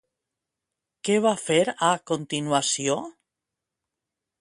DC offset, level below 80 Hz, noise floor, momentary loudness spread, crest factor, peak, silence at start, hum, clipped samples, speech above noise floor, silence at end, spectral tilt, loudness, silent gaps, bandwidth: under 0.1%; -70 dBFS; -86 dBFS; 8 LU; 22 dB; -6 dBFS; 1.05 s; none; under 0.1%; 62 dB; 1.3 s; -3.5 dB/octave; -24 LUFS; none; 11.5 kHz